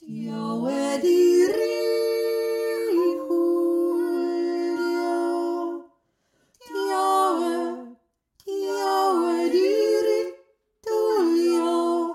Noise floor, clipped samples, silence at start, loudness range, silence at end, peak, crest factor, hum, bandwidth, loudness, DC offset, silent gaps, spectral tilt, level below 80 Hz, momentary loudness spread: -69 dBFS; under 0.1%; 0 s; 5 LU; 0 s; -10 dBFS; 14 dB; none; 14 kHz; -23 LUFS; under 0.1%; none; -4.5 dB/octave; -76 dBFS; 10 LU